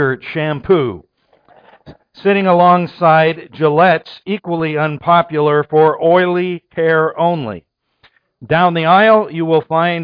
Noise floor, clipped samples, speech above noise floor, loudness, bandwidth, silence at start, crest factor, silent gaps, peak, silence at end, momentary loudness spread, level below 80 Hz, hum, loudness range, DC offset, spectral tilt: -55 dBFS; under 0.1%; 42 dB; -13 LUFS; 5.2 kHz; 0 s; 14 dB; none; 0 dBFS; 0 s; 10 LU; -54 dBFS; none; 2 LU; under 0.1%; -9.5 dB/octave